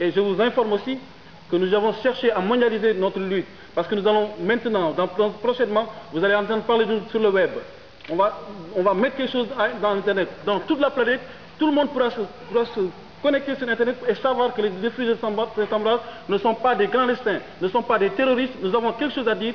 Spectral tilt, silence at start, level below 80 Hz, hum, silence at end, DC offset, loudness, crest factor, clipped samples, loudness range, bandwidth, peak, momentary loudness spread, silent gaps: -7 dB/octave; 0 s; -60 dBFS; none; 0 s; 0.4%; -22 LUFS; 14 dB; under 0.1%; 2 LU; 5.4 kHz; -8 dBFS; 6 LU; none